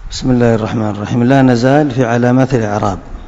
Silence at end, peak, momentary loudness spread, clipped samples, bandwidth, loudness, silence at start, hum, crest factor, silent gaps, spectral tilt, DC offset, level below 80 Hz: 0 s; 0 dBFS; 8 LU; 0.6%; 7.8 kHz; -12 LUFS; 0 s; none; 12 dB; none; -7 dB/octave; under 0.1%; -32 dBFS